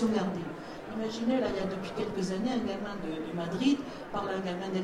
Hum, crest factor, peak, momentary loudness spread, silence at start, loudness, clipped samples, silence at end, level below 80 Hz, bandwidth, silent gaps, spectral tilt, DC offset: none; 16 dB; -16 dBFS; 8 LU; 0 s; -33 LUFS; under 0.1%; 0 s; -58 dBFS; 13 kHz; none; -6 dB/octave; under 0.1%